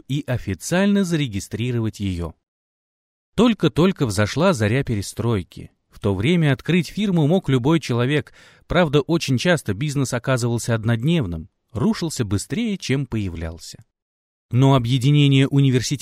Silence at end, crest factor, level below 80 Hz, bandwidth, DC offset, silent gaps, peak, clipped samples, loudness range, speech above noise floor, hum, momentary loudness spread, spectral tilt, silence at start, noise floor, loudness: 0.05 s; 18 dB; -44 dBFS; 15 kHz; under 0.1%; 2.48-3.32 s, 14.02-14.49 s; -4 dBFS; under 0.1%; 4 LU; over 70 dB; none; 10 LU; -6 dB/octave; 0.1 s; under -90 dBFS; -20 LUFS